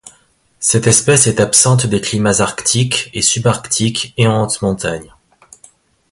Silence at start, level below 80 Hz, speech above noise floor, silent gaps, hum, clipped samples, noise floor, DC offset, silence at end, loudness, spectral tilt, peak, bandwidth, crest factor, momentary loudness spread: 0.05 s; -44 dBFS; 40 dB; none; none; under 0.1%; -54 dBFS; under 0.1%; 1.05 s; -13 LUFS; -3.5 dB/octave; 0 dBFS; 13 kHz; 16 dB; 8 LU